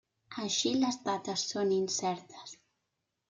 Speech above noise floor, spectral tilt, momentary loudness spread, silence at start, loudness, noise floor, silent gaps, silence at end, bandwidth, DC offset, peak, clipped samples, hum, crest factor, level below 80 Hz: 52 dB; -3 dB/octave; 17 LU; 0.3 s; -32 LUFS; -84 dBFS; none; 0.75 s; 9.6 kHz; under 0.1%; -18 dBFS; under 0.1%; none; 16 dB; -76 dBFS